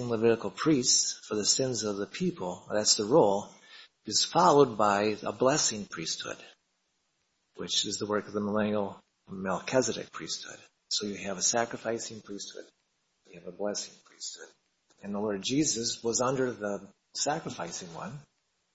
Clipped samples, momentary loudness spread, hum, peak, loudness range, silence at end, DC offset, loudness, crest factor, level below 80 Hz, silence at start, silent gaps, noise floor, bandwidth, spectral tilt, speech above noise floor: under 0.1%; 18 LU; none; -8 dBFS; 8 LU; 0.55 s; under 0.1%; -29 LUFS; 22 dB; -68 dBFS; 0 s; none; -77 dBFS; 8.2 kHz; -3 dB/octave; 47 dB